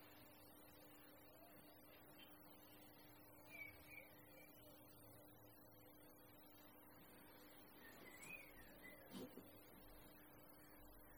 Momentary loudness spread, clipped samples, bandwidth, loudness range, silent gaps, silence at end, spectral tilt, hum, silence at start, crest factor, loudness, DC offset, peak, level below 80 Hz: 8 LU; under 0.1%; over 20 kHz; 4 LU; none; 0 s; -4 dB/octave; none; 0 s; 20 dB; -62 LUFS; under 0.1%; -44 dBFS; -80 dBFS